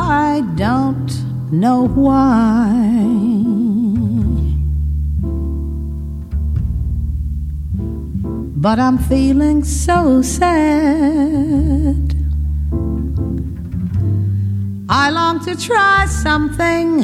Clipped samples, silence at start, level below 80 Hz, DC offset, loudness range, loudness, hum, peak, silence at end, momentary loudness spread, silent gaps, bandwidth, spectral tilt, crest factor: under 0.1%; 0 s; -22 dBFS; under 0.1%; 7 LU; -16 LUFS; none; 0 dBFS; 0 s; 10 LU; none; 13.5 kHz; -6.5 dB/octave; 14 dB